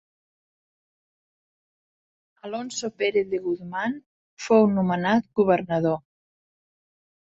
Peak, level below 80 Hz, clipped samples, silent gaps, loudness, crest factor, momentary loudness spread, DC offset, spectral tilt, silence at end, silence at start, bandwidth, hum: -6 dBFS; -66 dBFS; under 0.1%; 4.06-4.37 s; -24 LUFS; 20 dB; 14 LU; under 0.1%; -6 dB/octave; 1.4 s; 2.45 s; 8 kHz; none